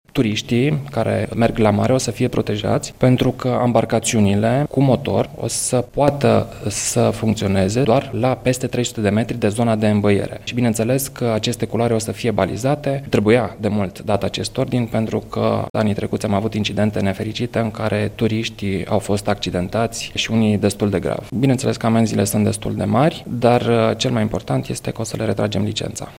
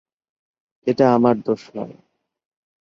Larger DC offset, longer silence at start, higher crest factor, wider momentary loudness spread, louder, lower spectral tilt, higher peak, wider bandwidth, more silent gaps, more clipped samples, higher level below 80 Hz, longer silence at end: neither; second, 0.15 s vs 0.85 s; about the same, 18 dB vs 20 dB; second, 6 LU vs 18 LU; about the same, -19 LUFS vs -19 LUFS; second, -5.5 dB/octave vs -8 dB/octave; about the same, 0 dBFS vs -2 dBFS; first, 16 kHz vs 7 kHz; first, 15.70-15.74 s vs none; neither; first, -44 dBFS vs -64 dBFS; second, 0 s vs 0.95 s